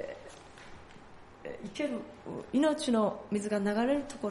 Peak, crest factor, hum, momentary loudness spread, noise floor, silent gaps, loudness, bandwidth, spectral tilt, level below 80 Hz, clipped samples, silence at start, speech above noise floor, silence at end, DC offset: -16 dBFS; 16 dB; none; 22 LU; -52 dBFS; none; -32 LUFS; 11.5 kHz; -5.5 dB/octave; -62 dBFS; under 0.1%; 0 s; 21 dB; 0 s; under 0.1%